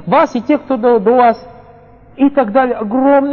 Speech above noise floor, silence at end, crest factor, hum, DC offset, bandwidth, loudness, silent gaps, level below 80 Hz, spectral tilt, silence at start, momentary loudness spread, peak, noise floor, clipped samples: 29 dB; 0 s; 12 dB; 50 Hz at -50 dBFS; under 0.1%; 7 kHz; -12 LUFS; none; -50 dBFS; -7.5 dB/octave; 0 s; 5 LU; 0 dBFS; -41 dBFS; under 0.1%